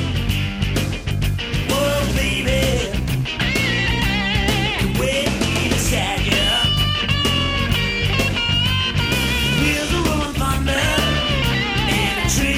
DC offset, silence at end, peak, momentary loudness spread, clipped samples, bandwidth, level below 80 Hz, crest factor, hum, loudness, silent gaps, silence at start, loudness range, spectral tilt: under 0.1%; 0 s; -4 dBFS; 4 LU; under 0.1%; 17 kHz; -26 dBFS; 16 dB; none; -18 LUFS; none; 0 s; 2 LU; -4 dB/octave